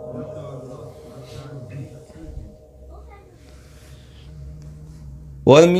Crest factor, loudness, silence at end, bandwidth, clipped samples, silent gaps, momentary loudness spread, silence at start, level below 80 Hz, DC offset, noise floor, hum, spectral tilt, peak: 22 dB; -20 LUFS; 0 s; 14 kHz; under 0.1%; none; 17 LU; 0.05 s; -44 dBFS; under 0.1%; -45 dBFS; none; -6 dB/octave; 0 dBFS